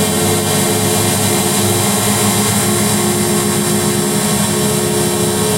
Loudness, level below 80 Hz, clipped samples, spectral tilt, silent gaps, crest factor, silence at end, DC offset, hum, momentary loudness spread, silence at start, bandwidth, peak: -13 LUFS; -42 dBFS; under 0.1%; -3.5 dB/octave; none; 14 dB; 0 s; under 0.1%; none; 2 LU; 0 s; 16 kHz; 0 dBFS